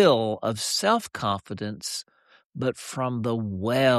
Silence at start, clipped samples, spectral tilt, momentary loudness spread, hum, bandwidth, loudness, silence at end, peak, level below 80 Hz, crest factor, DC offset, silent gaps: 0 s; under 0.1%; -4.5 dB/octave; 10 LU; none; 14 kHz; -27 LUFS; 0 s; -8 dBFS; -64 dBFS; 18 dB; under 0.1%; 2.45-2.50 s